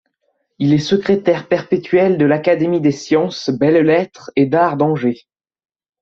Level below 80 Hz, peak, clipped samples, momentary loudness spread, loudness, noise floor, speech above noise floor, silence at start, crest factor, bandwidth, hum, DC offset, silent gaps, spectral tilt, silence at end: -56 dBFS; -2 dBFS; under 0.1%; 6 LU; -15 LUFS; -68 dBFS; 53 dB; 0.6 s; 14 dB; 7.6 kHz; none; under 0.1%; none; -7 dB/octave; 0.85 s